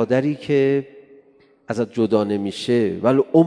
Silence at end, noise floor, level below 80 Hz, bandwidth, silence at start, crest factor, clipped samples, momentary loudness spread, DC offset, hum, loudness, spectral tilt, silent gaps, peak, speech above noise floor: 0 s; -53 dBFS; -64 dBFS; 10.5 kHz; 0 s; 18 dB; under 0.1%; 7 LU; under 0.1%; none; -20 LUFS; -7.5 dB/octave; none; -2 dBFS; 35 dB